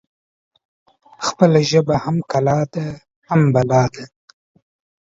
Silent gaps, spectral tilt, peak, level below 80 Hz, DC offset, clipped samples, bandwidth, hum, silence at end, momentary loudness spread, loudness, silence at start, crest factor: 3.16-3.22 s; -6.5 dB/octave; 0 dBFS; -50 dBFS; under 0.1%; under 0.1%; 7.8 kHz; none; 0.95 s; 13 LU; -17 LUFS; 1.2 s; 18 dB